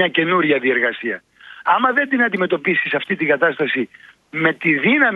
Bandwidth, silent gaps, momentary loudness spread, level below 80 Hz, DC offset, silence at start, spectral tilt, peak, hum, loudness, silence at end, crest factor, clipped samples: 5.2 kHz; none; 10 LU; -66 dBFS; under 0.1%; 0 s; -7.5 dB/octave; 0 dBFS; none; -17 LUFS; 0 s; 18 dB; under 0.1%